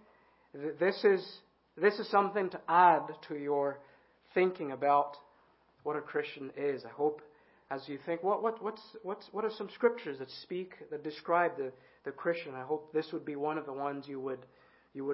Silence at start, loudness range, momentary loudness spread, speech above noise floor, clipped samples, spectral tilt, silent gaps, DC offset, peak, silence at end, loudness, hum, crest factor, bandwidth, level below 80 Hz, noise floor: 0.55 s; 7 LU; 14 LU; 34 dB; under 0.1%; -3.5 dB/octave; none; under 0.1%; -12 dBFS; 0 s; -33 LUFS; none; 22 dB; 5.6 kHz; -84 dBFS; -67 dBFS